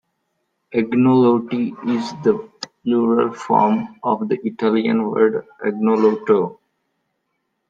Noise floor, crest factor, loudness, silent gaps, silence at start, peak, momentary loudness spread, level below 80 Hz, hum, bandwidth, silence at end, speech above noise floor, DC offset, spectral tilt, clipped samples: -73 dBFS; 16 dB; -19 LUFS; none; 0.7 s; -2 dBFS; 9 LU; -64 dBFS; none; 7.8 kHz; 1.15 s; 55 dB; under 0.1%; -7.5 dB/octave; under 0.1%